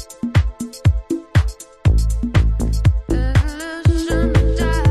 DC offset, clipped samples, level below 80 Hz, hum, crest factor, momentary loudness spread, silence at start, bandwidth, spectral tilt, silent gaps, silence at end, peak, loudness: under 0.1%; under 0.1%; -20 dBFS; none; 14 dB; 4 LU; 0 s; 13.5 kHz; -6.5 dB/octave; none; 0 s; -2 dBFS; -19 LUFS